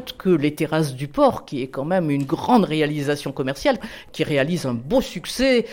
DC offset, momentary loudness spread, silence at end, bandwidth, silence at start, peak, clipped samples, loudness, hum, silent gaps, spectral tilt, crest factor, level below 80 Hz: under 0.1%; 9 LU; 0 s; 17 kHz; 0 s; -4 dBFS; under 0.1%; -21 LUFS; none; none; -6 dB/octave; 16 dB; -46 dBFS